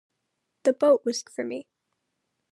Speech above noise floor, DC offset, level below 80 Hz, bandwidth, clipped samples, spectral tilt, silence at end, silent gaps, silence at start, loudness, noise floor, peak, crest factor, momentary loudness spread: 55 dB; under 0.1%; under -90 dBFS; 12 kHz; under 0.1%; -3 dB/octave; 0.9 s; none; 0.65 s; -25 LUFS; -79 dBFS; -8 dBFS; 18 dB; 13 LU